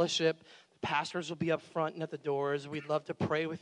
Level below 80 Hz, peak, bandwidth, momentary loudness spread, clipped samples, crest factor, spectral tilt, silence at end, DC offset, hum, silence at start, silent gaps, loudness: -78 dBFS; -16 dBFS; 11 kHz; 6 LU; under 0.1%; 18 dB; -4.5 dB/octave; 0.05 s; under 0.1%; none; 0 s; none; -34 LUFS